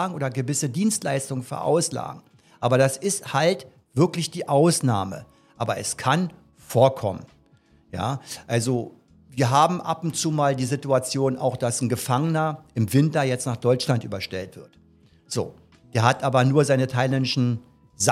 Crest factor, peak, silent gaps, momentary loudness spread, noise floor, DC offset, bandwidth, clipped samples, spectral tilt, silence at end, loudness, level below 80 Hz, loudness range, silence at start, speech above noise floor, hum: 22 dB; -2 dBFS; none; 12 LU; -58 dBFS; under 0.1%; 15.5 kHz; under 0.1%; -5 dB/octave; 0 s; -23 LUFS; -64 dBFS; 3 LU; 0 s; 35 dB; none